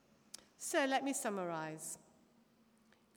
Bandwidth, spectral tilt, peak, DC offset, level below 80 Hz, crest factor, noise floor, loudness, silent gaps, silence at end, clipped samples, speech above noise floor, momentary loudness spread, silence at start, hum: over 20 kHz; -3 dB/octave; -22 dBFS; under 0.1%; -90 dBFS; 20 dB; -70 dBFS; -39 LUFS; none; 1.2 s; under 0.1%; 32 dB; 21 LU; 0.6 s; none